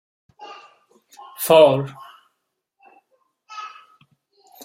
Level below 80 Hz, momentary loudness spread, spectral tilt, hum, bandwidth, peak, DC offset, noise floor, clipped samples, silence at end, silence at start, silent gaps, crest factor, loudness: -70 dBFS; 28 LU; -4.5 dB/octave; none; 16 kHz; -2 dBFS; under 0.1%; -76 dBFS; under 0.1%; 0.95 s; 0.4 s; none; 22 dB; -16 LUFS